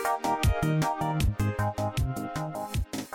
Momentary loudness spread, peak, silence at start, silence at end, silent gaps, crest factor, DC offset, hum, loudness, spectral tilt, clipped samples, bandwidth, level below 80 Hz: 7 LU; -16 dBFS; 0 s; 0 s; none; 12 dB; under 0.1%; none; -29 LUFS; -6 dB/octave; under 0.1%; 17.5 kHz; -36 dBFS